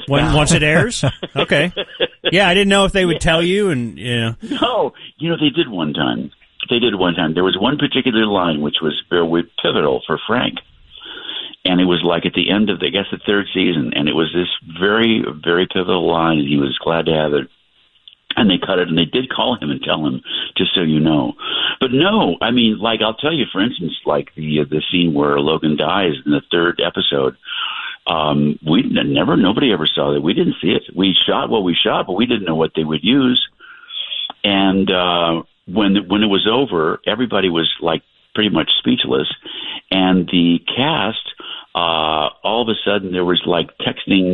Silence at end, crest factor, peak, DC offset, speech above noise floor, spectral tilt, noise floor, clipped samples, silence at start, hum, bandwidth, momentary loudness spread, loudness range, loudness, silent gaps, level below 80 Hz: 0 s; 16 dB; 0 dBFS; under 0.1%; 40 dB; -5 dB/octave; -56 dBFS; under 0.1%; 0 s; none; 11.5 kHz; 8 LU; 3 LU; -16 LUFS; none; -40 dBFS